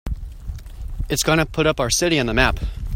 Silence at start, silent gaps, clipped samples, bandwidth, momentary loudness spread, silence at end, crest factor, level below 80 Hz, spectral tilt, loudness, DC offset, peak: 0.05 s; none; under 0.1%; 16.5 kHz; 18 LU; 0 s; 20 dB; -30 dBFS; -3.5 dB/octave; -19 LUFS; under 0.1%; 0 dBFS